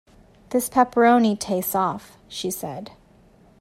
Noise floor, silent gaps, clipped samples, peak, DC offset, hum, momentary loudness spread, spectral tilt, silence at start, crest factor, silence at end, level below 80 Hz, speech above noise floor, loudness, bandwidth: -54 dBFS; none; under 0.1%; -4 dBFS; under 0.1%; none; 20 LU; -4.5 dB/octave; 0.5 s; 18 dB; 0.75 s; -58 dBFS; 32 dB; -21 LUFS; 16 kHz